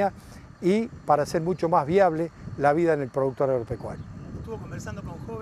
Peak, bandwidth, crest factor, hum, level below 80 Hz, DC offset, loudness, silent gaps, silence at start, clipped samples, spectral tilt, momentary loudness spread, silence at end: -6 dBFS; 13.5 kHz; 18 dB; none; -50 dBFS; under 0.1%; -25 LUFS; none; 0 s; under 0.1%; -7 dB/octave; 16 LU; 0 s